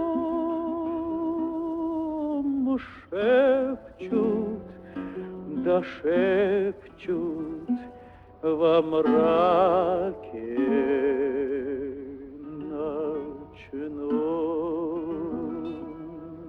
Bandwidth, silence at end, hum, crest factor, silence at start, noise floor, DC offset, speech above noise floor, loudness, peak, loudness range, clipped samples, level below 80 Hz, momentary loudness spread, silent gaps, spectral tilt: 5.4 kHz; 0 s; none; 16 dB; 0 s; -48 dBFS; under 0.1%; 24 dB; -26 LUFS; -10 dBFS; 7 LU; under 0.1%; -58 dBFS; 16 LU; none; -8.5 dB/octave